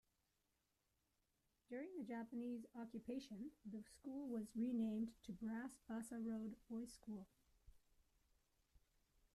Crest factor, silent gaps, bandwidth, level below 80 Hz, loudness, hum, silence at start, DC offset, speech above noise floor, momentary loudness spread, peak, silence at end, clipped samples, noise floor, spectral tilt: 16 dB; none; 13.5 kHz; -78 dBFS; -50 LUFS; none; 1.7 s; under 0.1%; 38 dB; 11 LU; -36 dBFS; 1.55 s; under 0.1%; -87 dBFS; -6 dB/octave